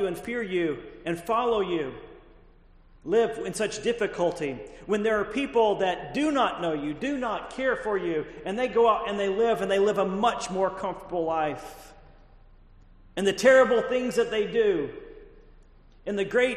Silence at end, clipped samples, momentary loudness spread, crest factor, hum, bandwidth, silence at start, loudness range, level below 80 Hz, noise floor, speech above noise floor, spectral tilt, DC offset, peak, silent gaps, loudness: 0 s; under 0.1%; 11 LU; 20 dB; none; 13.5 kHz; 0 s; 4 LU; -54 dBFS; -54 dBFS; 29 dB; -4.5 dB/octave; under 0.1%; -6 dBFS; none; -26 LUFS